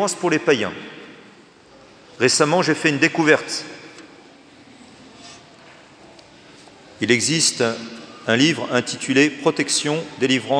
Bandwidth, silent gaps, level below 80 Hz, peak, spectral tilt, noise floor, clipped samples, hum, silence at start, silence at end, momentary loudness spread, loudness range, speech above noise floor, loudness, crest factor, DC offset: 10.5 kHz; none; -68 dBFS; 0 dBFS; -3 dB/octave; -48 dBFS; under 0.1%; none; 0 s; 0 s; 19 LU; 7 LU; 29 dB; -19 LUFS; 22 dB; under 0.1%